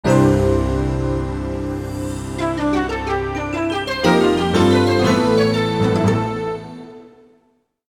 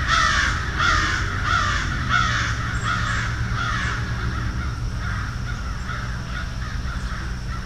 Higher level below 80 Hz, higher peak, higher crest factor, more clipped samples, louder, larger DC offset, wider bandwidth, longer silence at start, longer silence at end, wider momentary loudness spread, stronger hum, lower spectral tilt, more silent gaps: about the same, -32 dBFS vs -30 dBFS; first, 0 dBFS vs -6 dBFS; about the same, 18 dB vs 18 dB; neither; first, -18 LUFS vs -23 LUFS; second, under 0.1% vs 0.7%; first, 18 kHz vs 12.5 kHz; about the same, 0.05 s vs 0 s; first, 0.85 s vs 0 s; about the same, 11 LU vs 10 LU; neither; first, -6.5 dB/octave vs -4 dB/octave; neither